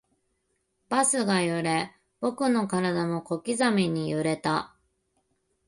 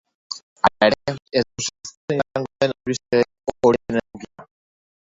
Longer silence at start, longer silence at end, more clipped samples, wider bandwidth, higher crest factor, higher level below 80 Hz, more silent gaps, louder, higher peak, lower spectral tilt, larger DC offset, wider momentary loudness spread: first, 0.9 s vs 0.3 s; first, 1 s vs 0.7 s; neither; first, 11.5 kHz vs 8 kHz; about the same, 18 dB vs 22 dB; second, -66 dBFS vs -54 dBFS; second, none vs 0.43-0.56 s, 1.97-2.08 s; second, -26 LUFS vs -22 LUFS; second, -10 dBFS vs 0 dBFS; about the same, -4.5 dB/octave vs -4.5 dB/octave; neither; second, 8 LU vs 15 LU